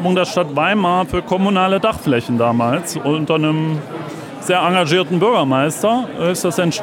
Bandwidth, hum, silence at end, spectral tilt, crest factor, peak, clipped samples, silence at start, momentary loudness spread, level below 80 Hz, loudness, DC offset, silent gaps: 17 kHz; none; 0 s; -5.5 dB/octave; 14 dB; -2 dBFS; under 0.1%; 0 s; 5 LU; -46 dBFS; -16 LUFS; under 0.1%; none